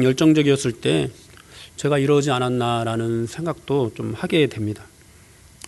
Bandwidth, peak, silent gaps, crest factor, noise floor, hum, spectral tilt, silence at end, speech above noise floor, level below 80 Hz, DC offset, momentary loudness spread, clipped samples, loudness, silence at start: 12 kHz; -4 dBFS; none; 16 dB; -49 dBFS; none; -6 dB/octave; 0.85 s; 29 dB; -54 dBFS; under 0.1%; 12 LU; under 0.1%; -21 LUFS; 0 s